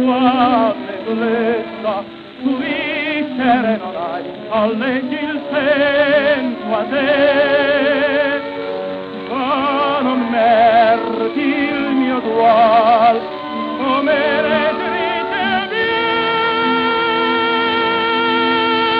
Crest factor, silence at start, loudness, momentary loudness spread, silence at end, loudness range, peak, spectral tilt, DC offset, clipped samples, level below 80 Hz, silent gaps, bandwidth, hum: 14 dB; 0 s; -16 LUFS; 10 LU; 0 s; 5 LU; -2 dBFS; -7 dB/octave; under 0.1%; under 0.1%; -54 dBFS; none; 5.4 kHz; none